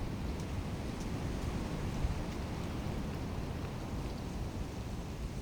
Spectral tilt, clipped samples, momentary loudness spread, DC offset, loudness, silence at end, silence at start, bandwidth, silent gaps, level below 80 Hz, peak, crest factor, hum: -6.5 dB/octave; under 0.1%; 4 LU; under 0.1%; -40 LUFS; 0 s; 0 s; over 20 kHz; none; -42 dBFS; -22 dBFS; 16 dB; none